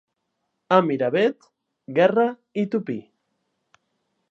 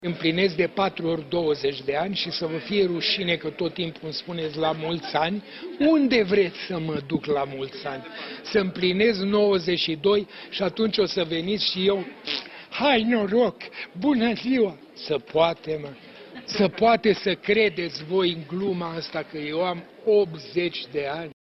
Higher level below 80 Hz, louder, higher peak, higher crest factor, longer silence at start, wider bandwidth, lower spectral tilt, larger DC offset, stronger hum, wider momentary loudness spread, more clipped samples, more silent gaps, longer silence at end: second, -78 dBFS vs -60 dBFS; about the same, -22 LUFS vs -24 LUFS; first, -2 dBFS vs -6 dBFS; about the same, 22 dB vs 18 dB; first, 0.7 s vs 0 s; first, 7.4 kHz vs 6.2 kHz; about the same, -7.5 dB/octave vs -6.5 dB/octave; neither; neither; about the same, 9 LU vs 11 LU; neither; neither; first, 1.3 s vs 0.1 s